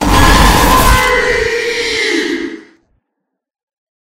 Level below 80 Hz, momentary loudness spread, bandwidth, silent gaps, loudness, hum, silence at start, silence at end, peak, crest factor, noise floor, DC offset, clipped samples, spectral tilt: -18 dBFS; 9 LU; 17 kHz; 3.63-3.67 s; -10 LUFS; none; 0 s; 0.4 s; 0 dBFS; 12 dB; -74 dBFS; under 0.1%; 0.6%; -3.5 dB/octave